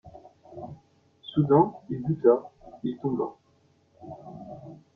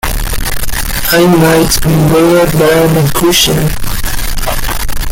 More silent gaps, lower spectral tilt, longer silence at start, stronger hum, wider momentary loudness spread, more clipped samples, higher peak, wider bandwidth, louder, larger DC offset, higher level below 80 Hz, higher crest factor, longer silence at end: neither; first, -10.5 dB/octave vs -4.5 dB/octave; about the same, 0.05 s vs 0.05 s; neither; first, 23 LU vs 9 LU; neither; second, -8 dBFS vs 0 dBFS; second, 4 kHz vs 17.5 kHz; second, -26 LUFS vs -10 LUFS; neither; second, -64 dBFS vs -18 dBFS; first, 22 dB vs 8 dB; first, 0.2 s vs 0 s